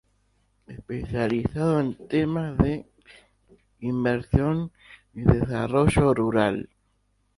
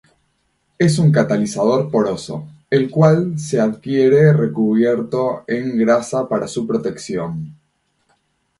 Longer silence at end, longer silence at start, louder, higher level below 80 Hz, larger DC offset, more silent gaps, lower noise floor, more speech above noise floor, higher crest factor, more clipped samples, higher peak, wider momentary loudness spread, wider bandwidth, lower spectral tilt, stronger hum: second, 0.7 s vs 1.05 s; about the same, 0.7 s vs 0.8 s; second, -25 LUFS vs -17 LUFS; first, -40 dBFS vs -56 dBFS; neither; neither; about the same, -69 dBFS vs -66 dBFS; second, 45 dB vs 50 dB; first, 24 dB vs 16 dB; neither; about the same, -2 dBFS vs 0 dBFS; first, 14 LU vs 11 LU; about the same, 11.5 kHz vs 11.5 kHz; about the same, -8 dB/octave vs -7 dB/octave; neither